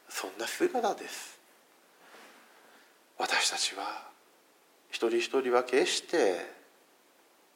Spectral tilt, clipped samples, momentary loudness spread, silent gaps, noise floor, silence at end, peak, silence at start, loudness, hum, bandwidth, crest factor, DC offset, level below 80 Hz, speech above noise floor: -1 dB/octave; under 0.1%; 14 LU; none; -64 dBFS; 1 s; -12 dBFS; 0.1 s; -30 LUFS; none; 16.5 kHz; 22 dB; under 0.1%; under -90 dBFS; 33 dB